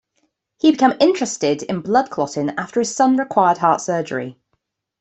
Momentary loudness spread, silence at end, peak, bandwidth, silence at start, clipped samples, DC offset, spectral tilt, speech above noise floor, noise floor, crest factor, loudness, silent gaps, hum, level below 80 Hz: 8 LU; 0.7 s; -2 dBFS; 8.4 kHz; 0.65 s; under 0.1%; under 0.1%; -4.5 dB/octave; 54 dB; -72 dBFS; 16 dB; -18 LUFS; none; none; -64 dBFS